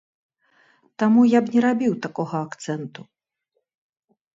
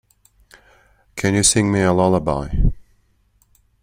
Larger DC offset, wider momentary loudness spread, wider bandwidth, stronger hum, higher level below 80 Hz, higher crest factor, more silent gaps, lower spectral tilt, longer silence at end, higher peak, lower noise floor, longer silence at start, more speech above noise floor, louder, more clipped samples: neither; first, 14 LU vs 9 LU; second, 7.8 kHz vs 16 kHz; second, none vs 50 Hz at -35 dBFS; second, -72 dBFS vs -28 dBFS; about the same, 18 dB vs 20 dB; neither; first, -7 dB/octave vs -4.5 dB/octave; first, 1.35 s vs 1 s; about the same, -4 dBFS vs -2 dBFS; first, -76 dBFS vs -60 dBFS; second, 1 s vs 1.15 s; first, 56 dB vs 44 dB; second, -21 LUFS vs -18 LUFS; neither